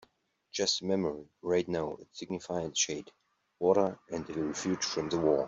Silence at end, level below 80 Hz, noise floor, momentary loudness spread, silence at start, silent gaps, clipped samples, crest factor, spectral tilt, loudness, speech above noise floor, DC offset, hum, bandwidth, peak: 0 s; -66 dBFS; -69 dBFS; 12 LU; 0.55 s; none; under 0.1%; 20 dB; -3.5 dB/octave; -32 LUFS; 38 dB; under 0.1%; none; 8 kHz; -12 dBFS